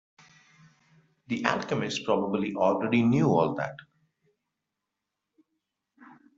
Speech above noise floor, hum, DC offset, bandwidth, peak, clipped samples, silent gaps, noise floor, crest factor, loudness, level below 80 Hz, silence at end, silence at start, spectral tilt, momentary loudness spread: 59 dB; none; under 0.1%; 7.8 kHz; -6 dBFS; under 0.1%; none; -85 dBFS; 24 dB; -27 LUFS; -68 dBFS; 0.3 s; 1.3 s; -6.5 dB/octave; 9 LU